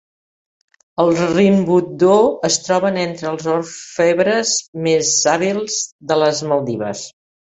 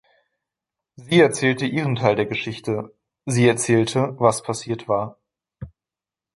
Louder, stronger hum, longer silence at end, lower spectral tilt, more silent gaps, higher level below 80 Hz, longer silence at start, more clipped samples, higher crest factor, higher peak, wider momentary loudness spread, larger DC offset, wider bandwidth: first, -16 LUFS vs -21 LUFS; neither; second, 0.5 s vs 0.7 s; about the same, -4 dB/octave vs -5 dB/octave; first, 4.68-4.73 s, 5.92-5.99 s vs none; about the same, -58 dBFS vs -56 dBFS; about the same, 1 s vs 1 s; neither; about the same, 16 dB vs 20 dB; about the same, -2 dBFS vs -2 dBFS; second, 9 LU vs 20 LU; neither; second, 8.4 kHz vs 11.5 kHz